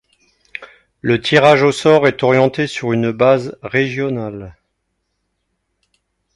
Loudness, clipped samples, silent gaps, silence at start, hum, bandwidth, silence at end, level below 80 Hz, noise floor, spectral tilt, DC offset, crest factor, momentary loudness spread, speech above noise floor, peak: -14 LUFS; under 0.1%; none; 0.6 s; none; 11.5 kHz; 1.85 s; -52 dBFS; -71 dBFS; -6 dB/octave; under 0.1%; 16 dB; 21 LU; 56 dB; 0 dBFS